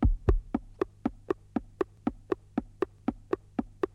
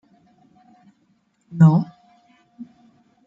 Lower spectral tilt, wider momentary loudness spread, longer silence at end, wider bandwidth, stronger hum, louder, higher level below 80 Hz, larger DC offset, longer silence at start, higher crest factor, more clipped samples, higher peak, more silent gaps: about the same, -9.5 dB/octave vs -10.5 dB/octave; second, 7 LU vs 28 LU; second, 0.1 s vs 0.65 s; first, 7 kHz vs 5.4 kHz; neither; second, -34 LUFS vs -16 LUFS; first, -36 dBFS vs -66 dBFS; neither; second, 0 s vs 1.55 s; about the same, 22 dB vs 20 dB; neither; second, -8 dBFS vs -4 dBFS; neither